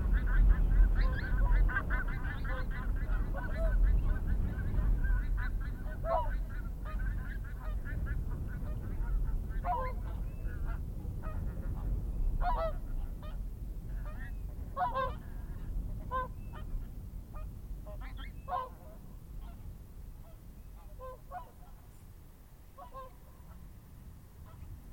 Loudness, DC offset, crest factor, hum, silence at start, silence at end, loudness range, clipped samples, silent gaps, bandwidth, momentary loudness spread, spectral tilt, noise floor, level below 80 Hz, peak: -37 LUFS; under 0.1%; 18 dB; none; 0 s; 0 s; 16 LU; under 0.1%; none; 16 kHz; 21 LU; -7.5 dB/octave; -54 dBFS; -34 dBFS; -14 dBFS